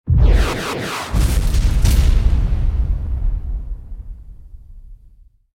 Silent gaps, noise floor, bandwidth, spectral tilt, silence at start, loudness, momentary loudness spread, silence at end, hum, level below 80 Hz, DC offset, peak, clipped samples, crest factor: none; -47 dBFS; 16 kHz; -5.5 dB/octave; 0.05 s; -19 LUFS; 18 LU; 0.6 s; none; -18 dBFS; under 0.1%; -2 dBFS; under 0.1%; 14 dB